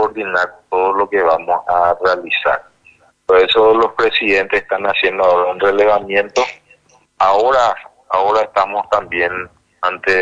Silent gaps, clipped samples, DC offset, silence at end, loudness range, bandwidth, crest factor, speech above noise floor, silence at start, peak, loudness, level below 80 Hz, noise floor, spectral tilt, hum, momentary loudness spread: none; under 0.1%; under 0.1%; 0 s; 3 LU; 7.8 kHz; 14 dB; 37 dB; 0 s; 0 dBFS; -15 LUFS; -48 dBFS; -51 dBFS; -3.5 dB/octave; none; 7 LU